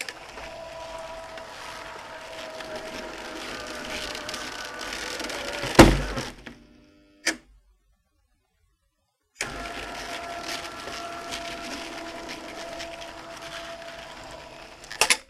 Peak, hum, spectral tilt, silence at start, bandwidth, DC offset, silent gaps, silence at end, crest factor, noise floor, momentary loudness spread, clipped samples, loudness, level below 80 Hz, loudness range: -2 dBFS; none; -3.5 dB/octave; 0 s; 15.5 kHz; under 0.1%; none; 0.05 s; 28 dB; -74 dBFS; 13 LU; under 0.1%; -29 LUFS; -40 dBFS; 13 LU